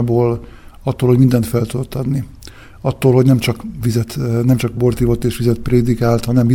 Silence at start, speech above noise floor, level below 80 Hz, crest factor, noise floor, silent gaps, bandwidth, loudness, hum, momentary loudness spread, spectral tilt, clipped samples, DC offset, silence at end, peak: 0 s; 23 dB; -34 dBFS; 14 dB; -37 dBFS; none; 17 kHz; -16 LUFS; none; 10 LU; -7.5 dB/octave; under 0.1%; under 0.1%; 0 s; 0 dBFS